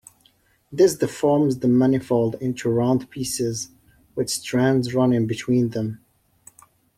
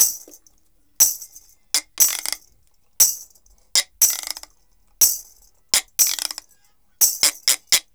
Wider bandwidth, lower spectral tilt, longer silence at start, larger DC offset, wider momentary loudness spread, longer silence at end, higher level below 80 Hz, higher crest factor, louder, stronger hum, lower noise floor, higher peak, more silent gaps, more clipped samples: second, 15.5 kHz vs over 20 kHz; first, -6 dB/octave vs 3 dB/octave; first, 0.7 s vs 0 s; second, under 0.1% vs 0.1%; second, 11 LU vs 15 LU; first, 1 s vs 0.15 s; about the same, -58 dBFS vs -60 dBFS; about the same, 16 dB vs 20 dB; second, -21 LUFS vs -18 LUFS; neither; about the same, -61 dBFS vs -63 dBFS; second, -6 dBFS vs -2 dBFS; neither; neither